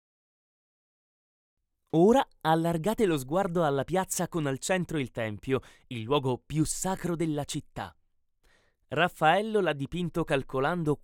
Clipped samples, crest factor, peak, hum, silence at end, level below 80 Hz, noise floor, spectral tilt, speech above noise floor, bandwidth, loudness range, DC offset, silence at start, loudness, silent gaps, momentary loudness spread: under 0.1%; 20 dB; -10 dBFS; none; 0.05 s; -52 dBFS; -68 dBFS; -5 dB/octave; 40 dB; 18.5 kHz; 5 LU; under 0.1%; 1.95 s; -28 LUFS; none; 10 LU